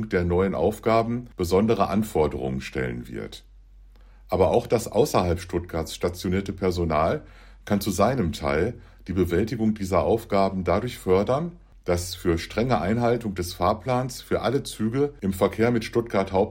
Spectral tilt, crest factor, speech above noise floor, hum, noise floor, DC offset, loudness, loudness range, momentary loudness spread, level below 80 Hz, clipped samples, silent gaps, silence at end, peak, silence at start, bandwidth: -6 dB/octave; 18 dB; 25 dB; none; -49 dBFS; under 0.1%; -25 LUFS; 2 LU; 8 LU; -46 dBFS; under 0.1%; none; 0 s; -6 dBFS; 0 s; 16.5 kHz